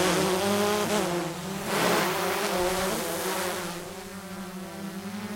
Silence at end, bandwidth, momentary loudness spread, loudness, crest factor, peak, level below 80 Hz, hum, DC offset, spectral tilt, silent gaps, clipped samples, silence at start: 0 s; 16.5 kHz; 14 LU; -28 LUFS; 18 dB; -10 dBFS; -54 dBFS; none; under 0.1%; -3.5 dB/octave; none; under 0.1%; 0 s